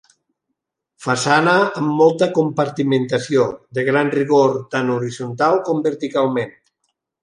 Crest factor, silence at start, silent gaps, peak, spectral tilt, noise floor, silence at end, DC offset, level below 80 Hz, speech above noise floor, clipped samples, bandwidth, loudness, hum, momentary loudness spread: 16 dB; 1 s; none; -2 dBFS; -5.5 dB/octave; -78 dBFS; 0.7 s; under 0.1%; -64 dBFS; 61 dB; under 0.1%; 11.5 kHz; -18 LUFS; none; 8 LU